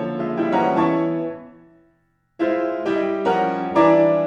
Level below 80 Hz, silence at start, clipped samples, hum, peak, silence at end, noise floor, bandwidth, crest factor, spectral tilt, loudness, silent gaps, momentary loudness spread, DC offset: -60 dBFS; 0 s; under 0.1%; none; -4 dBFS; 0 s; -64 dBFS; 7.2 kHz; 16 dB; -8 dB/octave; -20 LUFS; none; 10 LU; under 0.1%